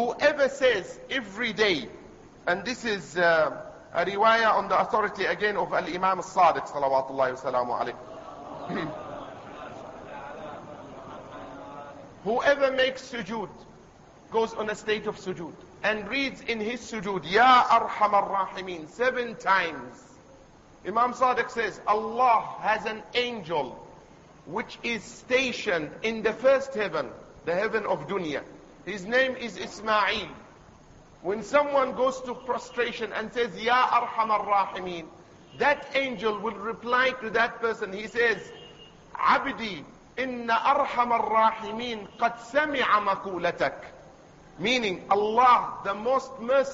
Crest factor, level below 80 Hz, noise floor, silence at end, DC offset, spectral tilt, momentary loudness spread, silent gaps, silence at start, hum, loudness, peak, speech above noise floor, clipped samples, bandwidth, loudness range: 20 dB; -60 dBFS; -53 dBFS; 0 s; under 0.1%; -4 dB/octave; 18 LU; none; 0 s; none; -26 LUFS; -8 dBFS; 27 dB; under 0.1%; 8 kHz; 6 LU